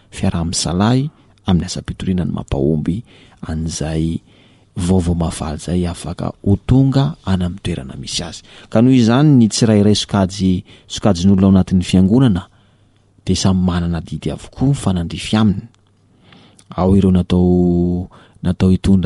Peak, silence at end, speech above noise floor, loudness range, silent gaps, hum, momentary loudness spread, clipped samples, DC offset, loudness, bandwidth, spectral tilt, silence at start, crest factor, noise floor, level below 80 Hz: -2 dBFS; 0 s; 38 dB; 7 LU; none; none; 13 LU; under 0.1%; under 0.1%; -16 LUFS; 11.5 kHz; -6.5 dB/octave; 0.15 s; 14 dB; -53 dBFS; -34 dBFS